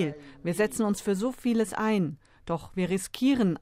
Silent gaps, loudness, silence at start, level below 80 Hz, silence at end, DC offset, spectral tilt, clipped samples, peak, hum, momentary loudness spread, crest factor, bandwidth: none; -28 LUFS; 0 s; -56 dBFS; 0.05 s; under 0.1%; -5.5 dB/octave; under 0.1%; -12 dBFS; none; 9 LU; 14 dB; 16 kHz